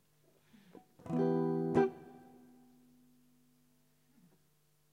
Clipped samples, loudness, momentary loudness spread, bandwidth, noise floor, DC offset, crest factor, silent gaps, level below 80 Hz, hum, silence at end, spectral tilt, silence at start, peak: under 0.1%; -34 LUFS; 24 LU; 10.5 kHz; -74 dBFS; under 0.1%; 22 dB; none; -76 dBFS; 50 Hz at -75 dBFS; 2.75 s; -9 dB/octave; 1.05 s; -18 dBFS